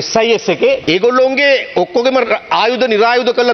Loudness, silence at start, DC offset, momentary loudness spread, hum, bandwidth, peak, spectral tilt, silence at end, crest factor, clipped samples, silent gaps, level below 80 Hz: -12 LUFS; 0 s; under 0.1%; 3 LU; none; 6.4 kHz; 0 dBFS; -3.5 dB/octave; 0 s; 12 dB; under 0.1%; none; -52 dBFS